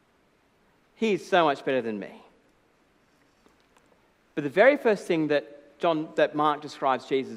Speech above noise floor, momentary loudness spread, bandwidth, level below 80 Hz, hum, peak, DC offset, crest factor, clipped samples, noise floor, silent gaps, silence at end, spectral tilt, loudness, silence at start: 40 dB; 13 LU; 12.5 kHz; -76 dBFS; none; -6 dBFS; under 0.1%; 22 dB; under 0.1%; -65 dBFS; none; 0 s; -5.5 dB/octave; -25 LUFS; 1 s